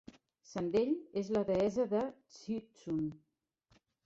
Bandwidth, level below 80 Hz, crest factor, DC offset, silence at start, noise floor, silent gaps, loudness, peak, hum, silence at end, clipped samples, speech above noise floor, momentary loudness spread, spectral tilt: 8 kHz; -68 dBFS; 16 dB; under 0.1%; 0.5 s; -73 dBFS; none; -36 LUFS; -22 dBFS; none; 0.9 s; under 0.1%; 38 dB; 10 LU; -7 dB/octave